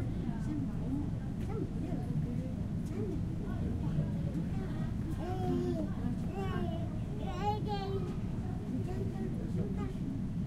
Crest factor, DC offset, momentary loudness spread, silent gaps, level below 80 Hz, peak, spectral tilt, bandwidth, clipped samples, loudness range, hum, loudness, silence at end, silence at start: 14 dB; under 0.1%; 3 LU; none; -44 dBFS; -22 dBFS; -8.5 dB/octave; 13.5 kHz; under 0.1%; 1 LU; none; -37 LUFS; 0 s; 0 s